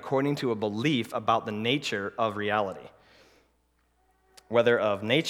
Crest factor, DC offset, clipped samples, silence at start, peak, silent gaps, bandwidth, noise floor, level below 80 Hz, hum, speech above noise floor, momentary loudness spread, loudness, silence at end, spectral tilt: 20 dB; under 0.1%; under 0.1%; 0 s; -8 dBFS; none; 16 kHz; -70 dBFS; -70 dBFS; none; 43 dB; 6 LU; -27 LUFS; 0 s; -5.5 dB/octave